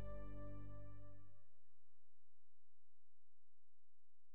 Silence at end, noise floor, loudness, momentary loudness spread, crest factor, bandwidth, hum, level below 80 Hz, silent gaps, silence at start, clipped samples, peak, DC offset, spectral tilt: 0 s; -81 dBFS; -58 LUFS; 11 LU; 16 dB; 4.2 kHz; none; -64 dBFS; none; 0 s; under 0.1%; -38 dBFS; 0.5%; -8.5 dB/octave